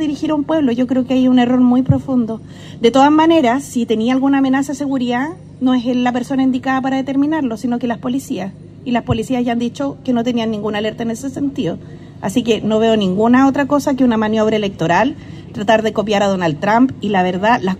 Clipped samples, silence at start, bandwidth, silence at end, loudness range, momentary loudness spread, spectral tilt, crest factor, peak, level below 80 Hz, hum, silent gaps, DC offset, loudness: under 0.1%; 0 s; 13.5 kHz; 0 s; 6 LU; 10 LU; -6 dB/octave; 16 dB; 0 dBFS; -48 dBFS; 50 Hz at -40 dBFS; none; under 0.1%; -16 LUFS